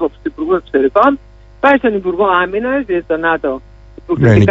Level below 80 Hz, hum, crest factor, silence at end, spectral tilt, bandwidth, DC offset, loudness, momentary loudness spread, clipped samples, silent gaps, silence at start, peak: -38 dBFS; none; 14 dB; 0 s; -8.5 dB/octave; 7.6 kHz; under 0.1%; -14 LUFS; 11 LU; under 0.1%; none; 0 s; 0 dBFS